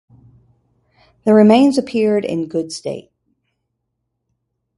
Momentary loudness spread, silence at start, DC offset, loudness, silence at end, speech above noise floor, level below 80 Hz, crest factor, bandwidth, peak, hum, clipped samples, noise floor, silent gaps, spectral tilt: 16 LU; 1.25 s; under 0.1%; -15 LUFS; 1.8 s; 60 dB; -60 dBFS; 18 dB; 11.5 kHz; 0 dBFS; none; under 0.1%; -74 dBFS; none; -6.5 dB/octave